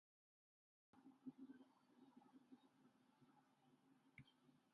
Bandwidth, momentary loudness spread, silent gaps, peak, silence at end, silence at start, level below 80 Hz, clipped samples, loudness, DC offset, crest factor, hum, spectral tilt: 4.9 kHz; 8 LU; none; -46 dBFS; 0 s; 0.95 s; under -90 dBFS; under 0.1%; -65 LUFS; under 0.1%; 24 dB; none; -5.5 dB/octave